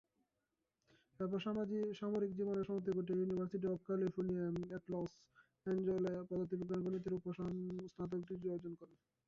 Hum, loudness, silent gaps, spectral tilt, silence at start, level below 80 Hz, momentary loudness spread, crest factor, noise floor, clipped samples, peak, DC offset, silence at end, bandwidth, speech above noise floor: none; -42 LUFS; none; -8 dB/octave; 1.2 s; -72 dBFS; 7 LU; 12 dB; -89 dBFS; under 0.1%; -28 dBFS; under 0.1%; 0.4 s; 7.2 kHz; 48 dB